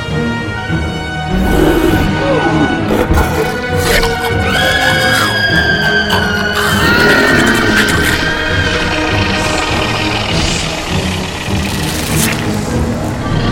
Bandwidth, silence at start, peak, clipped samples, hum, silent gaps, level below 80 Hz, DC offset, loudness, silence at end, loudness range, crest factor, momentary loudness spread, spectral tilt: 17 kHz; 0 s; 0 dBFS; under 0.1%; none; none; -24 dBFS; under 0.1%; -12 LUFS; 0 s; 4 LU; 12 dB; 7 LU; -4.5 dB/octave